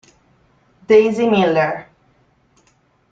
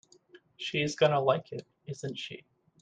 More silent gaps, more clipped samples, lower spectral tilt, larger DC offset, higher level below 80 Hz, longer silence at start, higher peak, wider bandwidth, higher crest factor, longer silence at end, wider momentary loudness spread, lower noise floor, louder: neither; neither; first, -6.5 dB/octave vs -5 dB/octave; neither; first, -58 dBFS vs -72 dBFS; first, 0.9 s vs 0.6 s; first, -2 dBFS vs -12 dBFS; second, 7.6 kHz vs 9.6 kHz; about the same, 18 dB vs 20 dB; first, 1.3 s vs 0.45 s; second, 9 LU vs 18 LU; about the same, -59 dBFS vs -59 dBFS; first, -15 LUFS vs -30 LUFS